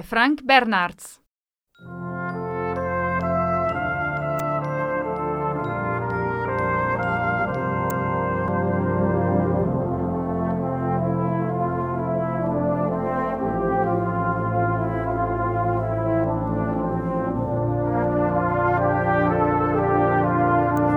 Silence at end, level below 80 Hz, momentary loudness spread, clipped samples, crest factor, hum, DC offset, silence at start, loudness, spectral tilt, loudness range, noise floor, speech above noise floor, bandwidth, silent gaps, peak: 0 s; -44 dBFS; 5 LU; under 0.1%; 20 dB; none; under 0.1%; 0 s; -23 LUFS; -8 dB/octave; 3 LU; -79 dBFS; 58 dB; 16 kHz; 1.31-1.41 s; -2 dBFS